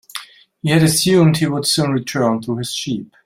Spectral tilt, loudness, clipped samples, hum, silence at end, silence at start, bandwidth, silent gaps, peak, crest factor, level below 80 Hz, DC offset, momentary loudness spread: -5 dB/octave; -16 LUFS; under 0.1%; none; 0.2 s; 0.15 s; 16 kHz; none; -2 dBFS; 16 dB; -52 dBFS; under 0.1%; 12 LU